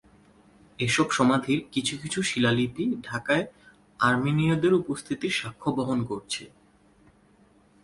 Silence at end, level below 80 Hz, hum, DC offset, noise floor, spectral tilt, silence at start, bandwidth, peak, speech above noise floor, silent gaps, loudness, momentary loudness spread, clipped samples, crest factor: 1.35 s; -58 dBFS; none; under 0.1%; -59 dBFS; -5 dB/octave; 0.8 s; 11.5 kHz; -8 dBFS; 34 dB; none; -26 LUFS; 9 LU; under 0.1%; 20 dB